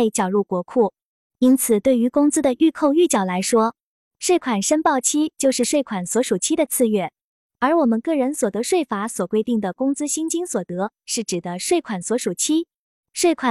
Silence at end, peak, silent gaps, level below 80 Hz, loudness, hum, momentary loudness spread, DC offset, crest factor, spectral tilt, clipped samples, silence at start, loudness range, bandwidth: 0 s; -6 dBFS; 1.02-1.30 s, 3.83-4.11 s, 7.24-7.50 s, 12.76-13.03 s; -64 dBFS; -20 LUFS; none; 7 LU; under 0.1%; 14 dB; -4 dB/octave; under 0.1%; 0 s; 4 LU; 14 kHz